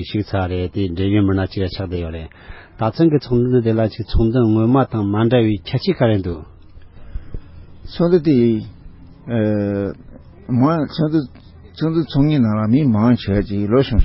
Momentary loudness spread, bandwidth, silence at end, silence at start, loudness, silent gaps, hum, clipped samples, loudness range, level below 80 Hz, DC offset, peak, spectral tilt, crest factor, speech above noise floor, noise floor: 18 LU; 5.8 kHz; 0 s; 0 s; -18 LUFS; none; none; under 0.1%; 4 LU; -32 dBFS; under 0.1%; -2 dBFS; -12.5 dB/octave; 16 dB; 23 dB; -39 dBFS